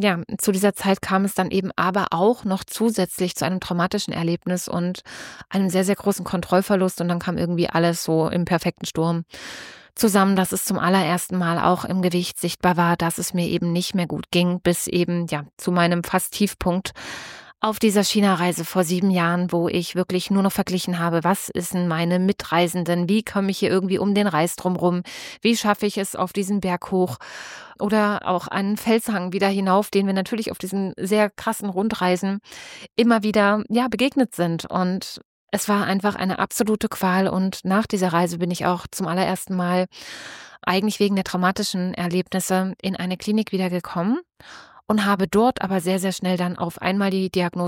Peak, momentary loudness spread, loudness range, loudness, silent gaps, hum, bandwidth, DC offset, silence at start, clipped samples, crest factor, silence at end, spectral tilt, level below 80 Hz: -4 dBFS; 7 LU; 2 LU; -22 LUFS; 15.53-15.57 s, 35.25-35.47 s; none; 17 kHz; under 0.1%; 0 s; under 0.1%; 18 dB; 0 s; -5 dB/octave; -54 dBFS